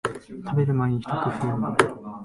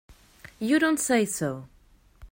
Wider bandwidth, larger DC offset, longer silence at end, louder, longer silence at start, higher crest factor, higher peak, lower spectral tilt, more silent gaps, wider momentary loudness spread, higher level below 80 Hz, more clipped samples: second, 11.5 kHz vs 16.5 kHz; neither; about the same, 0 s vs 0.05 s; about the same, -25 LUFS vs -25 LUFS; about the same, 0.05 s vs 0.1 s; first, 22 dB vs 16 dB; first, -2 dBFS vs -12 dBFS; first, -6.5 dB/octave vs -4 dB/octave; neither; second, 6 LU vs 11 LU; about the same, -56 dBFS vs -56 dBFS; neither